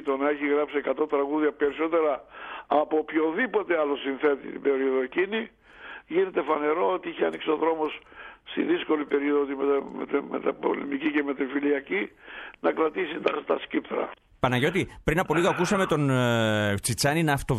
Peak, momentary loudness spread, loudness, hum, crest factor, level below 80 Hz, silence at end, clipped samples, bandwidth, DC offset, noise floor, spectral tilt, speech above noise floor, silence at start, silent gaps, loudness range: -8 dBFS; 8 LU; -26 LUFS; none; 18 dB; -52 dBFS; 0 s; under 0.1%; 14 kHz; under 0.1%; -45 dBFS; -5.5 dB/octave; 19 dB; 0 s; none; 3 LU